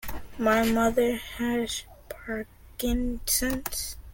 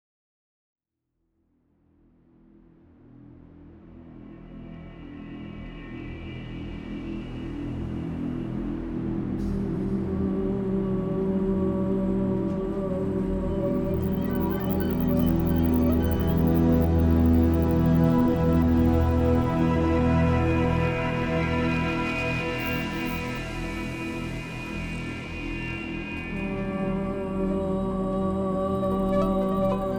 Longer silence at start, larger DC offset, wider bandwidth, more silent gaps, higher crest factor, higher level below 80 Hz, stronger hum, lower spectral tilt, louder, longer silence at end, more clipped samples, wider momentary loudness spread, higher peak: second, 0 s vs 3.25 s; neither; second, 17 kHz vs 20 kHz; neither; about the same, 18 dB vs 16 dB; about the same, -40 dBFS vs -36 dBFS; neither; second, -3.5 dB/octave vs -8.5 dB/octave; about the same, -27 LUFS vs -26 LUFS; about the same, 0 s vs 0 s; neither; about the same, 14 LU vs 15 LU; about the same, -10 dBFS vs -10 dBFS